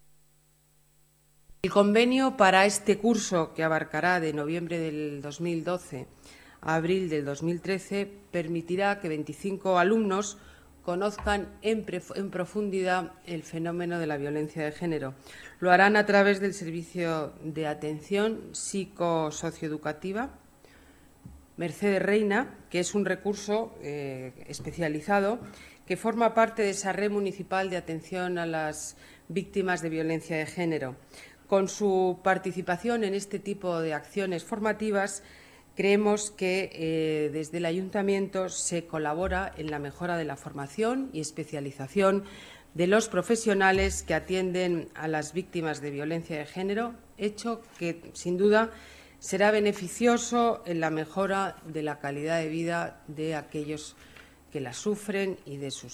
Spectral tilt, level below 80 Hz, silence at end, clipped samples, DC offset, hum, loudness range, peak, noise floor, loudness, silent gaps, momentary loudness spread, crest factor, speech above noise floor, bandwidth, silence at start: -5 dB/octave; -54 dBFS; 0 s; under 0.1%; under 0.1%; none; 6 LU; -6 dBFS; -64 dBFS; -29 LUFS; none; 13 LU; 24 dB; 36 dB; 15.5 kHz; 1.5 s